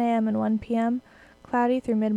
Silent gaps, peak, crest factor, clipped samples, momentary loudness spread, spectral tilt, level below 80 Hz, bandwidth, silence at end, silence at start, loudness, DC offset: none; -12 dBFS; 12 dB; under 0.1%; 5 LU; -8 dB/octave; -58 dBFS; 8.2 kHz; 0 s; 0 s; -25 LUFS; under 0.1%